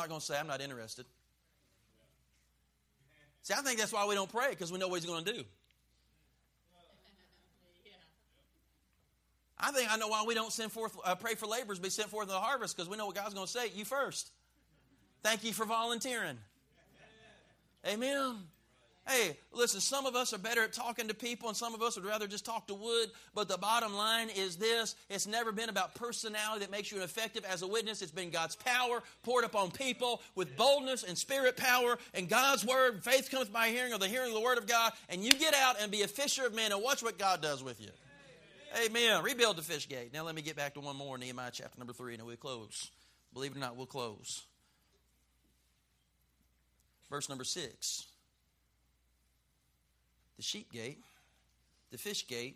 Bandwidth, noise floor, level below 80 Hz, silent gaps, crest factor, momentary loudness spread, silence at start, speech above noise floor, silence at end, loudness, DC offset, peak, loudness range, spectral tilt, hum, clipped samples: 15.5 kHz; -76 dBFS; -76 dBFS; none; 32 dB; 14 LU; 0 s; 40 dB; 0 s; -34 LUFS; under 0.1%; -6 dBFS; 14 LU; -1.5 dB/octave; none; under 0.1%